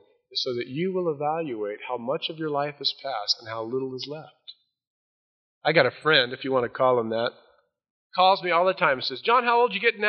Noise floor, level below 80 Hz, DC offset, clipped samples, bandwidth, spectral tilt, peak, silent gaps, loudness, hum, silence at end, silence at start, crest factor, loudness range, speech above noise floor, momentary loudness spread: under -90 dBFS; -74 dBFS; under 0.1%; under 0.1%; 6.4 kHz; -1.5 dB/octave; -4 dBFS; 4.87-5.61 s, 7.90-8.10 s; -24 LUFS; none; 0 s; 0.3 s; 22 dB; 7 LU; over 65 dB; 11 LU